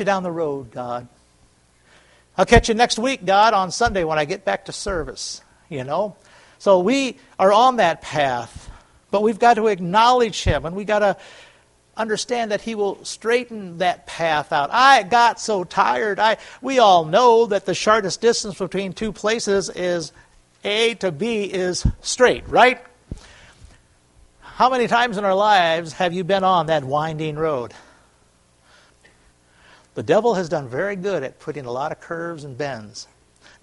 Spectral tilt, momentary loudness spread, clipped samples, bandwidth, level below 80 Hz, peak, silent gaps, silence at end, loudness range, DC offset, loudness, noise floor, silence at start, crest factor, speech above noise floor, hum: -4 dB/octave; 15 LU; under 0.1%; 11.5 kHz; -40 dBFS; 0 dBFS; none; 0.6 s; 7 LU; under 0.1%; -19 LUFS; -57 dBFS; 0 s; 20 dB; 38 dB; none